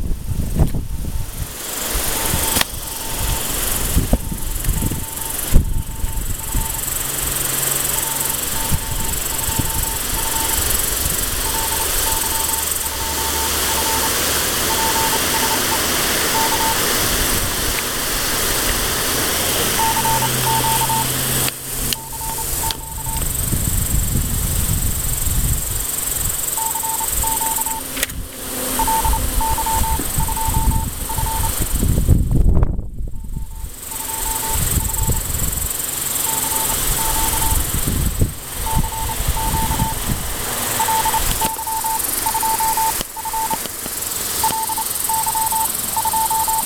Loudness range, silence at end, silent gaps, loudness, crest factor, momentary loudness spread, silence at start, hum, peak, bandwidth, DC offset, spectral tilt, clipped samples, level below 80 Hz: 4 LU; 0 s; none; -18 LUFS; 20 dB; 7 LU; 0 s; none; 0 dBFS; 17.5 kHz; under 0.1%; -2.5 dB/octave; under 0.1%; -26 dBFS